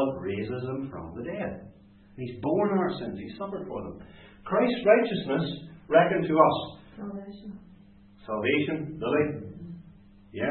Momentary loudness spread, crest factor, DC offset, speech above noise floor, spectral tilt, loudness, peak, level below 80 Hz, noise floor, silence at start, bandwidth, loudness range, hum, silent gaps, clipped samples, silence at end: 22 LU; 24 dB; under 0.1%; 26 dB; -10.5 dB/octave; -27 LUFS; -6 dBFS; -58 dBFS; -54 dBFS; 0 s; 4.4 kHz; 7 LU; none; none; under 0.1%; 0 s